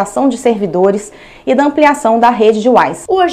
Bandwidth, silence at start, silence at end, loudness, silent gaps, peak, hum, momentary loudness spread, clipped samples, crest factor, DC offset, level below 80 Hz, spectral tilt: 14.5 kHz; 0 s; 0 s; -11 LUFS; none; 0 dBFS; none; 7 LU; 0.7%; 12 dB; under 0.1%; -48 dBFS; -5 dB/octave